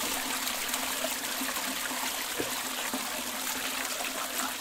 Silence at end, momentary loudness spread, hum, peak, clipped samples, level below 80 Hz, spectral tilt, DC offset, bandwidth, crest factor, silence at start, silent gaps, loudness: 0 s; 2 LU; none; -14 dBFS; under 0.1%; -62 dBFS; 0 dB/octave; under 0.1%; 17.5 kHz; 18 dB; 0 s; none; -31 LUFS